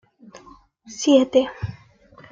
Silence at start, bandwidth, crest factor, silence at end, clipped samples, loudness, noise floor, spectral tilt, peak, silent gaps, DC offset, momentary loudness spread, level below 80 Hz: 0.35 s; 7.6 kHz; 20 dB; 0.6 s; under 0.1%; -19 LUFS; -50 dBFS; -5 dB/octave; -4 dBFS; none; under 0.1%; 18 LU; -54 dBFS